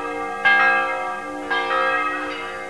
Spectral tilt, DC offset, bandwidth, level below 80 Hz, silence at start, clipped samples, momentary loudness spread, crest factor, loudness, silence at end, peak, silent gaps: -3 dB/octave; 0.4%; 11 kHz; -58 dBFS; 0 s; under 0.1%; 12 LU; 16 dB; -20 LUFS; 0 s; -4 dBFS; none